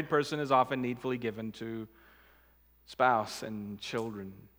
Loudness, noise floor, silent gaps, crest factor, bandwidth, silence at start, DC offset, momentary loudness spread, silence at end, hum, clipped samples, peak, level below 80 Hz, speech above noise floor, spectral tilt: -32 LUFS; -64 dBFS; none; 22 dB; 19.5 kHz; 0 s; under 0.1%; 14 LU; 0.1 s; none; under 0.1%; -12 dBFS; -68 dBFS; 31 dB; -5.5 dB/octave